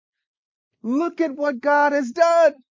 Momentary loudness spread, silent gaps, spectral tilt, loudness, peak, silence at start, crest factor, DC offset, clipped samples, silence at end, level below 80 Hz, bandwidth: 8 LU; none; -4 dB/octave; -19 LUFS; -4 dBFS; 0.85 s; 18 dB; under 0.1%; under 0.1%; 0.25 s; -82 dBFS; 7.6 kHz